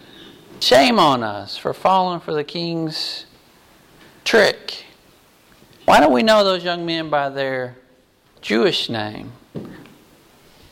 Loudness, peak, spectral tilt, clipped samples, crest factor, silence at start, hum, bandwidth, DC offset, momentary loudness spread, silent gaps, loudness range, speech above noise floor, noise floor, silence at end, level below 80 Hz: -18 LUFS; -4 dBFS; -4 dB/octave; under 0.1%; 16 dB; 0.2 s; none; 16.5 kHz; under 0.1%; 20 LU; none; 6 LU; 37 dB; -55 dBFS; 0.9 s; -52 dBFS